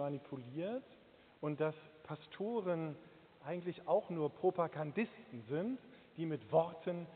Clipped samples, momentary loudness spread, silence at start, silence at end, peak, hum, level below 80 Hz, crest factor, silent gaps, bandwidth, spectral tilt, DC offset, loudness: under 0.1%; 15 LU; 0 s; 0 s; -20 dBFS; none; -82 dBFS; 20 dB; none; 4.5 kHz; -6.5 dB/octave; under 0.1%; -40 LUFS